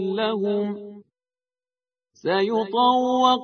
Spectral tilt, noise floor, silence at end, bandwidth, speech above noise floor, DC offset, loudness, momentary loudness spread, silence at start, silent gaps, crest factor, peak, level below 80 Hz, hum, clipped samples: -5.5 dB/octave; under -90 dBFS; 0 s; 6.6 kHz; over 69 dB; under 0.1%; -22 LUFS; 13 LU; 0 s; none; 18 dB; -4 dBFS; -70 dBFS; none; under 0.1%